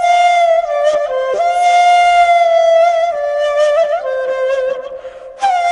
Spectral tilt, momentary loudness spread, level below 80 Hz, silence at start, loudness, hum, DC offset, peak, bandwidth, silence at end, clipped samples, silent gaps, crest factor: 0 dB/octave; 9 LU; -52 dBFS; 0 s; -12 LUFS; none; under 0.1%; -2 dBFS; 10.5 kHz; 0 s; under 0.1%; none; 10 dB